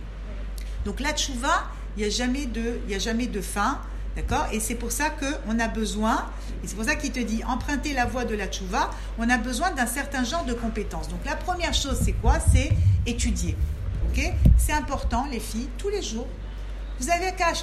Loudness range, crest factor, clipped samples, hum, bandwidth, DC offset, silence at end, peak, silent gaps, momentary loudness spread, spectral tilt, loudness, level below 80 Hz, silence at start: 4 LU; 20 dB; under 0.1%; none; 14 kHz; under 0.1%; 0 s; -4 dBFS; none; 11 LU; -4.5 dB/octave; -26 LUFS; -30 dBFS; 0 s